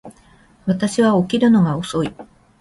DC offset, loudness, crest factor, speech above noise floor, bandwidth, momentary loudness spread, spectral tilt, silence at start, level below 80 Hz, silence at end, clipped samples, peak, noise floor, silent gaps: under 0.1%; -18 LUFS; 14 dB; 34 dB; 11.5 kHz; 10 LU; -6.5 dB/octave; 0.05 s; -52 dBFS; 0.4 s; under 0.1%; -4 dBFS; -51 dBFS; none